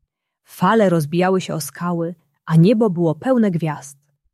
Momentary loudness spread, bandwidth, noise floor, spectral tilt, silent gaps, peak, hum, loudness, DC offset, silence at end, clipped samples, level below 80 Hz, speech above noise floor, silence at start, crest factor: 11 LU; 14 kHz; -63 dBFS; -7 dB/octave; none; -4 dBFS; none; -18 LUFS; under 0.1%; 0.4 s; under 0.1%; -62 dBFS; 46 dB; 0.55 s; 14 dB